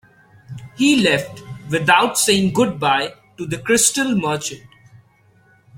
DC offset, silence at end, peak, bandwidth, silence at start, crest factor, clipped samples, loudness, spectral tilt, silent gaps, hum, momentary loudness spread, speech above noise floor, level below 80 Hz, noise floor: under 0.1%; 0 s; 0 dBFS; 16.5 kHz; 0.5 s; 20 dB; under 0.1%; -17 LUFS; -3 dB/octave; none; none; 20 LU; 37 dB; -56 dBFS; -54 dBFS